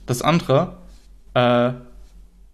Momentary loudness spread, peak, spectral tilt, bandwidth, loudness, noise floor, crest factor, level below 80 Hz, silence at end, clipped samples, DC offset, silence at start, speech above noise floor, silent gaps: 10 LU; -4 dBFS; -6 dB/octave; 13.5 kHz; -20 LUFS; -45 dBFS; 18 dB; -46 dBFS; 0.5 s; under 0.1%; under 0.1%; 0 s; 27 dB; none